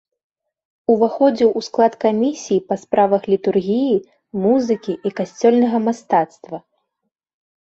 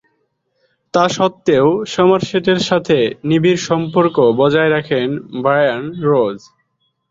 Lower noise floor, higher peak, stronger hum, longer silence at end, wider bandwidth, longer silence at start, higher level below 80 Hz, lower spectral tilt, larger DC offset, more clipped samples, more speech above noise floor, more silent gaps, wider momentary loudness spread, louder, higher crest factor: first, -77 dBFS vs -66 dBFS; about the same, -2 dBFS vs -2 dBFS; neither; first, 1.05 s vs 0.75 s; about the same, 7.8 kHz vs 7.8 kHz; about the same, 0.9 s vs 0.95 s; second, -62 dBFS vs -54 dBFS; about the same, -6.5 dB/octave vs -5.5 dB/octave; neither; neither; first, 60 dB vs 52 dB; neither; first, 9 LU vs 6 LU; second, -18 LUFS vs -15 LUFS; about the same, 16 dB vs 14 dB